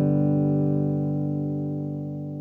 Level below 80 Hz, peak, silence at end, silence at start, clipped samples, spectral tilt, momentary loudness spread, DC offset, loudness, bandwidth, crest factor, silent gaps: -68 dBFS; -12 dBFS; 0 s; 0 s; under 0.1%; -13 dB/octave; 9 LU; under 0.1%; -25 LUFS; 2.6 kHz; 12 dB; none